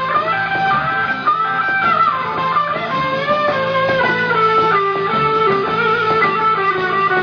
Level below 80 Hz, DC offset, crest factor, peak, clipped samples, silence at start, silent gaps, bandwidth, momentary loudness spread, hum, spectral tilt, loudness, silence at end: -50 dBFS; under 0.1%; 12 dB; -4 dBFS; under 0.1%; 0 s; none; 5.4 kHz; 4 LU; none; -6 dB/octave; -15 LUFS; 0 s